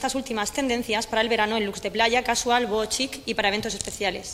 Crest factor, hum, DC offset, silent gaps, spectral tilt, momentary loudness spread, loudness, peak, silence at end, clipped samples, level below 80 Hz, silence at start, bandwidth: 20 dB; none; under 0.1%; none; -2 dB/octave; 6 LU; -24 LUFS; -6 dBFS; 0 s; under 0.1%; -50 dBFS; 0 s; 16 kHz